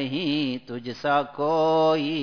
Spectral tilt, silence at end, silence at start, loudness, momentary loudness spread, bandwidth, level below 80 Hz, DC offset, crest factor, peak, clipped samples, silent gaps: -6.5 dB/octave; 0 s; 0 s; -24 LUFS; 10 LU; 5.4 kHz; -66 dBFS; 0.2%; 14 dB; -10 dBFS; under 0.1%; none